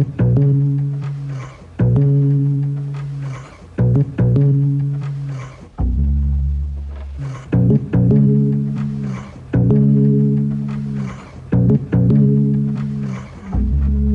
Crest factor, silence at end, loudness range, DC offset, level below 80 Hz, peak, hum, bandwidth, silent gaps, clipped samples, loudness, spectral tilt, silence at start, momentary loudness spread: 12 dB; 0 s; 3 LU; under 0.1%; -26 dBFS; -4 dBFS; none; 3.5 kHz; none; under 0.1%; -17 LUFS; -11 dB/octave; 0 s; 15 LU